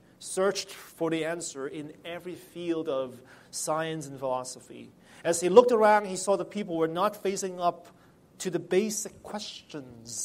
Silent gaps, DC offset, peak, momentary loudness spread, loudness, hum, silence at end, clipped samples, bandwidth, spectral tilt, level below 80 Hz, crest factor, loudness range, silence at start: none; under 0.1%; -4 dBFS; 19 LU; -28 LUFS; none; 0 s; under 0.1%; 16 kHz; -4 dB/octave; -72 dBFS; 26 dB; 9 LU; 0.2 s